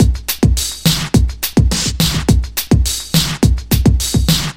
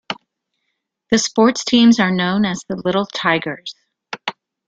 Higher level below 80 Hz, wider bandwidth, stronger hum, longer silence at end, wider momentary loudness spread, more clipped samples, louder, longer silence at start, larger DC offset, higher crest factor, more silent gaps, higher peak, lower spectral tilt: first, -18 dBFS vs -58 dBFS; first, 16.5 kHz vs 7.8 kHz; neither; second, 0 s vs 0.35 s; second, 2 LU vs 17 LU; neither; first, -14 LUFS vs -17 LUFS; about the same, 0 s vs 0.1 s; first, 1% vs under 0.1%; about the same, 14 dB vs 18 dB; neither; about the same, 0 dBFS vs -2 dBFS; about the same, -4.5 dB/octave vs -4 dB/octave